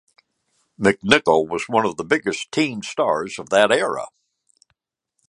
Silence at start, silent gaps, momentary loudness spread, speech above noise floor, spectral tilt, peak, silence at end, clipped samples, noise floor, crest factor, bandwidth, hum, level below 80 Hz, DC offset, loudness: 0.8 s; none; 9 LU; 56 dB; -4 dB/octave; 0 dBFS; 1.2 s; under 0.1%; -76 dBFS; 22 dB; 11.5 kHz; none; -58 dBFS; under 0.1%; -20 LUFS